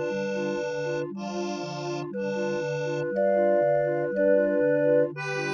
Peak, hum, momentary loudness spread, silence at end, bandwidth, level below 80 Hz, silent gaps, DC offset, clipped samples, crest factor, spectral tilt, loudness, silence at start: -12 dBFS; none; 10 LU; 0 s; 7.6 kHz; -66 dBFS; none; under 0.1%; under 0.1%; 14 dB; -6.5 dB/octave; -26 LUFS; 0 s